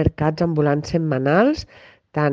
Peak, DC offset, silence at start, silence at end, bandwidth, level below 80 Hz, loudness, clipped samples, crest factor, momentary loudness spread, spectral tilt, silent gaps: -4 dBFS; under 0.1%; 0 s; 0 s; 7.4 kHz; -42 dBFS; -20 LUFS; under 0.1%; 16 dB; 8 LU; -7.5 dB/octave; none